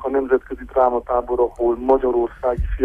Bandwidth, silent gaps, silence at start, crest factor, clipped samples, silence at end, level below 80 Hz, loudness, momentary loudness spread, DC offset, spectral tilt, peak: 3.6 kHz; none; 0 s; 16 dB; under 0.1%; 0 s; -32 dBFS; -20 LUFS; 5 LU; under 0.1%; -9.5 dB/octave; -4 dBFS